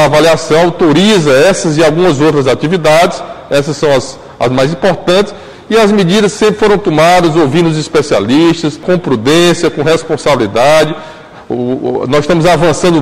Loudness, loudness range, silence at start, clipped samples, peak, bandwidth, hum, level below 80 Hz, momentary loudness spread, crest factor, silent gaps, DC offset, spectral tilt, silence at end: -9 LUFS; 2 LU; 0 s; under 0.1%; 0 dBFS; 16 kHz; none; -36 dBFS; 7 LU; 8 dB; none; 0.7%; -5 dB/octave; 0 s